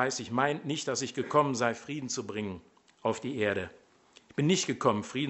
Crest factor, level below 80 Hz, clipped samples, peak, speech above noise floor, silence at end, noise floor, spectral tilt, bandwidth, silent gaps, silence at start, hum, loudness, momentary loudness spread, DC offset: 20 dB; -70 dBFS; under 0.1%; -10 dBFS; 29 dB; 0 s; -60 dBFS; -4.5 dB/octave; 8.2 kHz; none; 0 s; none; -31 LUFS; 10 LU; under 0.1%